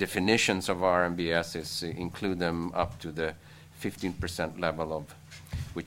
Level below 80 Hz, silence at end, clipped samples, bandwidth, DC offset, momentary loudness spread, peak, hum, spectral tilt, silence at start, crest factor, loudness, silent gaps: -50 dBFS; 0 s; under 0.1%; 16 kHz; under 0.1%; 13 LU; -8 dBFS; none; -4.5 dB/octave; 0 s; 24 dB; -30 LUFS; none